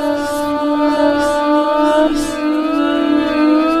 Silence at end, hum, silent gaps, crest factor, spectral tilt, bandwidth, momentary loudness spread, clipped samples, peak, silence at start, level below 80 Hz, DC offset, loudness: 0 s; none; none; 12 dB; -4 dB/octave; 14 kHz; 5 LU; under 0.1%; -2 dBFS; 0 s; -40 dBFS; under 0.1%; -15 LUFS